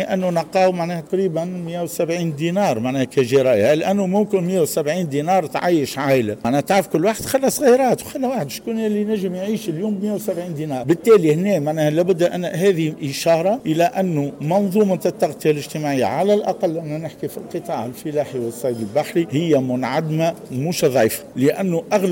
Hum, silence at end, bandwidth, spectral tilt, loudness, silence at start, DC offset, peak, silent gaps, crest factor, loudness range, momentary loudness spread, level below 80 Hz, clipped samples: none; 0 s; 17 kHz; -6 dB/octave; -19 LUFS; 0 s; under 0.1%; -4 dBFS; none; 14 dB; 4 LU; 9 LU; -58 dBFS; under 0.1%